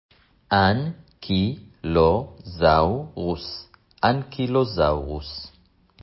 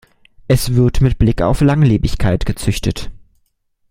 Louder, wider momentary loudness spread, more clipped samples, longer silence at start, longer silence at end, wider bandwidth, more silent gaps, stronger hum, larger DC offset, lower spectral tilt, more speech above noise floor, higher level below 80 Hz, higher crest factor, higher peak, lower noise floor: second, -23 LUFS vs -15 LUFS; first, 16 LU vs 8 LU; neither; about the same, 0.5 s vs 0.5 s; second, 0.55 s vs 0.75 s; second, 5.8 kHz vs 16 kHz; neither; neither; neither; first, -10.5 dB/octave vs -6.5 dB/octave; second, 33 dB vs 50 dB; second, -38 dBFS vs -24 dBFS; about the same, 18 dB vs 14 dB; second, -4 dBFS vs 0 dBFS; second, -55 dBFS vs -63 dBFS